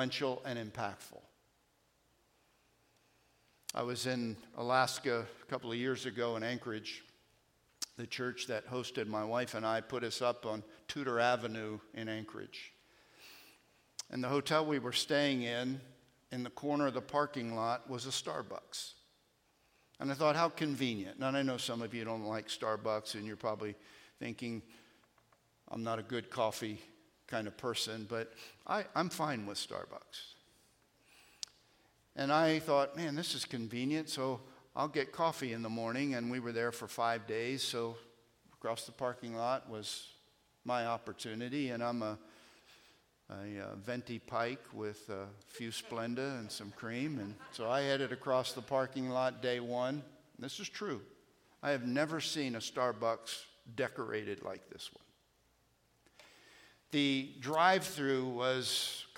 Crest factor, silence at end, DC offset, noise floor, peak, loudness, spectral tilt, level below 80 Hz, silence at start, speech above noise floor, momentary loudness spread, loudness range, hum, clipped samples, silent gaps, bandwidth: 24 dB; 0.05 s; under 0.1%; -74 dBFS; -14 dBFS; -37 LUFS; -4 dB/octave; -80 dBFS; 0 s; 37 dB; 14 LU; 7 LU; none; under 0.1%; none; 16.5 kHz